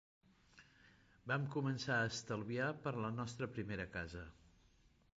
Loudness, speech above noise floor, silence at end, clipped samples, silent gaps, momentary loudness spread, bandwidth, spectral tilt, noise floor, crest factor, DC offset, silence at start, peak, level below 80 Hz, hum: -42 LUFS; 30 dB; 0.7 s; under 0.1%; none; 11 LU; 7.8 kHz; -5.5 dB/octave; -71 dBFS; 18 dB; under 0.1%; 0.55 s; -26 dBFS; -66 dBFS; none